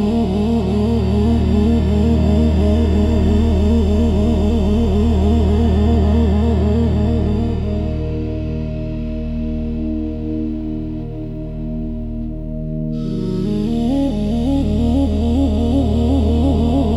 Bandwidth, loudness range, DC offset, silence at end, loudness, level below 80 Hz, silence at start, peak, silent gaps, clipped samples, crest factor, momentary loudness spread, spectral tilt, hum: 11 kHz; 9 LU; under 0.1%; 0 s; -17 LUFS; -22 dBFS; 0 s; -4 dBFS; none; under 0.1%; 12 dB; 10 LU; -9 dB/octave; none